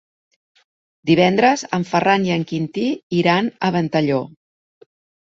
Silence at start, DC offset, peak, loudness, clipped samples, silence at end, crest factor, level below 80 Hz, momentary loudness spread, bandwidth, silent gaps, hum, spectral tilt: 1.05 s; under 0.1%; -2 dBFS; -18 LUFS; under 0.1%; 1.1 s; 18 dB; -60 dBFS; 9 LU; 7.8 kHz; 3.03-3.10 s; none; -6 dB/octave